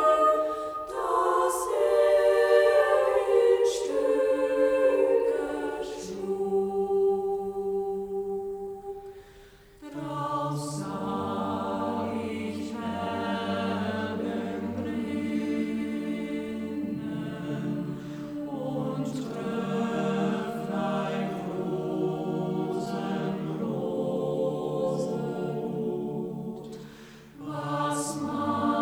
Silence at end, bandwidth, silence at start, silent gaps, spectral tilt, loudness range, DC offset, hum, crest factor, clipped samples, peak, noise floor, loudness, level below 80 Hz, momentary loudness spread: 0 s; over 20 kHz; 0 s; none; -6 dB/octave; 10 LU; under 0.1%; none; 20 dB; under 0.1%; -8 dBFS; -52 dBFS; -28 LUFS; -60 dBFS; 12 LU